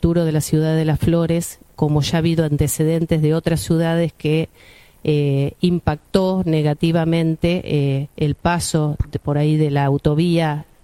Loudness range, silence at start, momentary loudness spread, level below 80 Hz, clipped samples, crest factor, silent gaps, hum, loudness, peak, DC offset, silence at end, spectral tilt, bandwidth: 1 LU; 0 s; 4 LU; -36 dBFS; under 0.1%; 18 dB; none; none; -19 LUFS; 0 dBFS; under 0.1%; 0.2 s; -6.5 dB/octave; 16 kHz